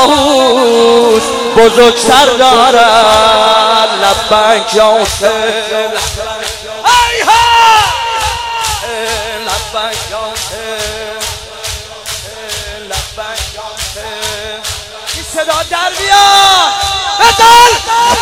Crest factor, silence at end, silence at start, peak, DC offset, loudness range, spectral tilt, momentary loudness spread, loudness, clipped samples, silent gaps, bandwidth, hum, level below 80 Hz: 10 dB; 0 s; 0 s; 0 dBFS; 0.5%; 13 LU; -2 dB/octave; 14 LU; -9 LUFS; 2%; none; over 20 kHz; none; -34 dBFS